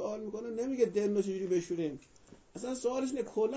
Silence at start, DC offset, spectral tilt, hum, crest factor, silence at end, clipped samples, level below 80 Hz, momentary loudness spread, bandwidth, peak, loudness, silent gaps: 0 s; under 0.1%; -6 dB/octave; none; 18 dB; 0 s; under 0.1%; -70 dBFS; 10 LU; 8 kHz; -16 dBFS; -34 LUFS; none